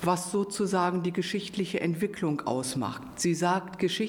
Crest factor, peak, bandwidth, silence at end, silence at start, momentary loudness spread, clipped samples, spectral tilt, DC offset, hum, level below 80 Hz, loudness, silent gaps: 18 dB; -12 dBFS; 18 kHz; 0 s; 0 s; 5 LU; under 0.1%; -5 dB/octave; under 0.1%; none; -64 dBFS; -29 LUFS; none